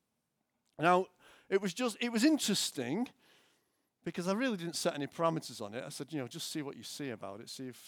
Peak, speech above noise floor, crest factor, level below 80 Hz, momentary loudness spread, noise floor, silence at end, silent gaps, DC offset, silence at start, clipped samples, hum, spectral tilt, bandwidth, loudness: -14 dBFS; 49 dB; 22 dB; -86 dBFS; 14 LU; -83 dBFS; 0 s; none; under 0.1%; 0.8 s; under 0.1%; none; -4 dB/octave; over 20 kHz; -35 LUFS